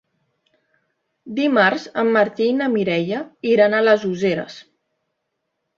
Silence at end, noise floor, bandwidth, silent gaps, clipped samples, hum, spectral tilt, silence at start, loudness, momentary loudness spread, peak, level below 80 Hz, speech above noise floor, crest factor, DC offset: 1.15 s; -76 dBFS; 7.4 kHz; none; under 0.1%; none; -6 dB/octave; 1.25 s; -18 LUFS; 10 LU; -2 dBFS; -66 dBFS; 58 dB; 18 dB; under 0.1%